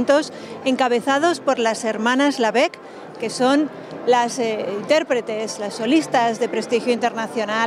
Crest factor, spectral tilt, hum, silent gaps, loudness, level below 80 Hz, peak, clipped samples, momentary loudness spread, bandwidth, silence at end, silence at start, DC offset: 16 dB; -3.5 dB/octave; none; none; -20 LUFS; -70 dBFS; -4 dBFS; under 0.1%; 9 LU; 13.5 kHz; 0 s; 0 s; under 0.1%